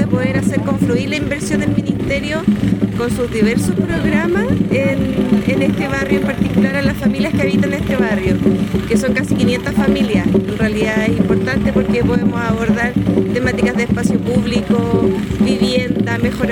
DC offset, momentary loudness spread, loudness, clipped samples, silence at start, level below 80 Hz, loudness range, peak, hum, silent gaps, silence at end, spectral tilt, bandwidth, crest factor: under 0.1%; 3 LU; -16 LUFS; under 0.1%; 0 s; -34 dBFS; 1 LU; -2 dBFS; none; none; 0 s; -6.5 dB/octave; 18 kHz; 14 dB